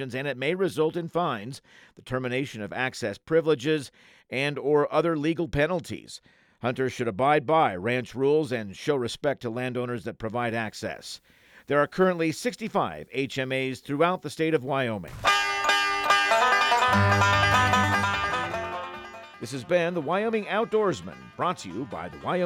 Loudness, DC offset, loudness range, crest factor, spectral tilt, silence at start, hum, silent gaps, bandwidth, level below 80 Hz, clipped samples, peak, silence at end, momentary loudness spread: -26 LUFS; under 0.1%; 7 LU; 18 dB; -5 dB/octave; 0 s; none; none; 16.5 kHz; -56 dBFS; under 0.1%; -8 dBFS; 0 s; 14 LU